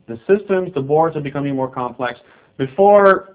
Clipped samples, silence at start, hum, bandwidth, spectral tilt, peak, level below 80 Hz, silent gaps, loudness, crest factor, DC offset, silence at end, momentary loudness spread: under 0.1%; 0.1 s; none; 4 kHz; -10.5 dB/octave; 0 dBFS; -56 dBFS; none; -17 LUFS; 16 dB; under 0.1%; 0.1 s; 14 LU